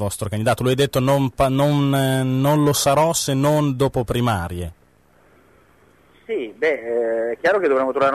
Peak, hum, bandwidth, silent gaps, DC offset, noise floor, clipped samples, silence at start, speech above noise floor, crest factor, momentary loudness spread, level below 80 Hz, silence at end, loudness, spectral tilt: -8 dBFS; none; 13.5 kHz; none; under 0.1%; -55 dBFS; under 0.1%; 0 s; 37 dB; 12 dB; 8 LU; -44 dBFS; 0 s; -19 LUFS; -5.5 dB/octave